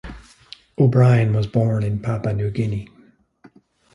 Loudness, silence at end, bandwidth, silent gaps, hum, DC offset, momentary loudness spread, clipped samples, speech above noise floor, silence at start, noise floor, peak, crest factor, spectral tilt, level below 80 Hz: -19 LUFS; 1.1 s; 9.8 kHz; none; none; under 0.1%; 14 LU; under 0.1%; 36 dB; 0.05 s; -53 dBFS; -4 dBFS; 16 dB; -9 dB/octave; -46 dBFS